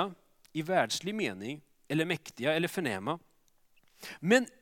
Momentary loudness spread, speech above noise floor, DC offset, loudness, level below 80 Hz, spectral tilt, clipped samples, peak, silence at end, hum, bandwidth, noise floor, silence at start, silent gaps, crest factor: 15 LU; 36 dB; under 0.1%; -32 LUFS; -76 dBFS; -4.5 dB/octave; under 0.1%; -10 dBFS; 0.15 s; none; 17.5 kHz; -67 dBFS; 0 s; none; 22 dB